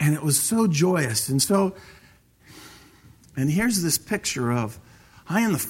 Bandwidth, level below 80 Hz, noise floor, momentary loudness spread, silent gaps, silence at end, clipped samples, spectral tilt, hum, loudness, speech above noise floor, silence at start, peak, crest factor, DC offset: 16.5 kHz; -56 dBFS; -55 dBFS; 7 LU; none; 0 s; under 0.1%; -4.5 dB/octave; none; -23 LUFS; 32 dB; 0 s; -8 dBFS; 18 dB; under 0.1%